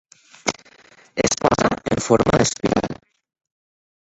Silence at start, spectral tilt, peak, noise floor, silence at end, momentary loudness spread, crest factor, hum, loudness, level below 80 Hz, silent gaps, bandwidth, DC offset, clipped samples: 0.45 s; -4.5 dB/octave; -2 dBFS; -51 dBFS; 1.2 s; 14 LU; 20 dB; none; -20 LUFS; -44 dBFS; none; 8.4 kHz; under 0.1%; under 0.1%